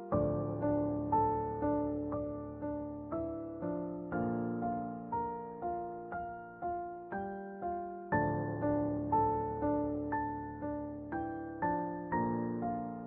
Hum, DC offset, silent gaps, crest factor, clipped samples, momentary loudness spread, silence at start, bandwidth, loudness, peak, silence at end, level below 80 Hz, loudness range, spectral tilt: none; under 0.1%; none; 18 dB; under 0.1%; 9 LU; 0 s; 2.9 kHz; -37 LUFS; -18 dBFS; 0 s; -56 dBFS; 4 LU; -10 dB/octave